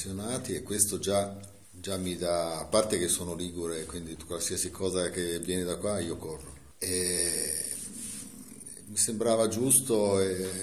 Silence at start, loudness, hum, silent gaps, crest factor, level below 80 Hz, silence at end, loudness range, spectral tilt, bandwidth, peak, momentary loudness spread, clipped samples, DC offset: 0 s; -29 LUFS; none; none; 24 dB; -56 dBFS; 0 s; 5 LU; -3.5 dB/octave; 14.5 kHz; -8 dBFS; 15 LU; under 0.1%; 0.2%